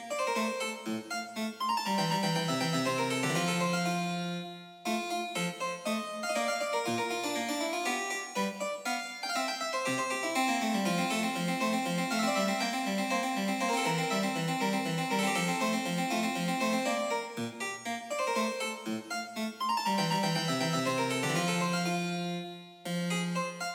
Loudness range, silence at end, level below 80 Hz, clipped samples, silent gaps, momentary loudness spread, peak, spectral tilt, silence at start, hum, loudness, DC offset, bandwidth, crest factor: 3 LU; 0 s; -86 dBFS; under 0.1%; none; 7 LU; -16 dBFS; -4 dB/octave; 0 s; none; -31 LUFS; under 0.1%; 16.5 kHz; 14 dB